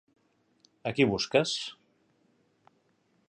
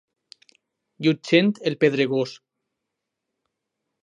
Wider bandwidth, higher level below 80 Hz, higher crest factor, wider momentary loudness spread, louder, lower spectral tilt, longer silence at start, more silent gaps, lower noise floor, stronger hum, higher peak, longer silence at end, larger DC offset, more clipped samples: about the same, 9.8 kHz vs 9.8 kHz; first, -64 dBFS vs -76 dBFS; about the same, 24 dB vs 22 dB; first, 12 LU vs 7 LU; second, -29 LUFS vs -22 LUFS; second, -4.5 dB/octave vs -6.5 dB/octave; second, 0.85 s vs 1 s; neither; second, -71 dBFS vs -82 dBFS; neither; second, -10 dBFS vs -4 dBFS; about the same, 1.6 s vs 1.65 s; neither; neither